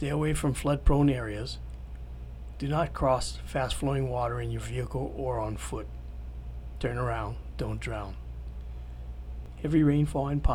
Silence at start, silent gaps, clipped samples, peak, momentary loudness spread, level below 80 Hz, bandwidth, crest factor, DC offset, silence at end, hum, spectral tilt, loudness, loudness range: 0 s; none; under 0.1%; -12 dBFS; 17 LU; -36 dBFS; 15.5 kHz; 18 dB; under 0.1%; 0 s; none; -6.5 dB/octave; -30 LUFS; 6 LU